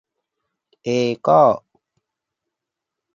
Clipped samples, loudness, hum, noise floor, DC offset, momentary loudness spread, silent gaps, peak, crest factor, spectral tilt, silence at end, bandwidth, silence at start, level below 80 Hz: under 0.1%; -17 LUFS; none; -84 dBFS; under 0.1%; 13 LU; none; -2 dBFS; 20 dB; -6.5 dB/octave; 1.55 s; 7.4 kHz; 0.85 s; -66 dBFS